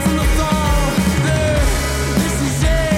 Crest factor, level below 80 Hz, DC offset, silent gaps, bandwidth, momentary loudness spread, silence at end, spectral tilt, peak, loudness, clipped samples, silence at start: 12 dB; -20 dBFS; under 0.1%; none; 16.5 kHz; 2 LU; 0 s; -5 dB/octave; -4 dBFS; -17 LUFS; under 0.1%; 0 s